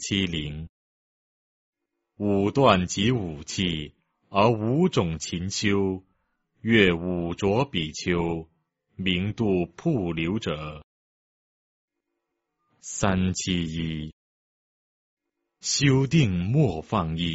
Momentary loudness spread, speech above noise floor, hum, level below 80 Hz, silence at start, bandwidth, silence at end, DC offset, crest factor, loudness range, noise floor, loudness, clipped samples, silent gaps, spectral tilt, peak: 14 LU; 57 dB; none; -48 dBFS; 0 s; 8 kHz; 0 s; under 0.1%; 22 dB; 6 LU; -81 dBFS; -25 LUFS; under 0.1%; 0.69-1.73 s, 10.84-11.88 s, 14.13-15.17 s; -5 dB/octave; -4 dBFS